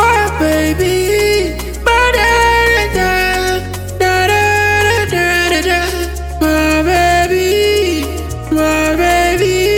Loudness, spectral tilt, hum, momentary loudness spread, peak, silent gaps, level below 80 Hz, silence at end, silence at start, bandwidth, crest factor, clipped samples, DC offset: -12 LUFS; -4 dB/octave; none; 8 LU; -2 dBFS; none; -24 dBFS; 0 s; 0 s; 19 kHz; 10 dB; under 0.1%; under 0.1%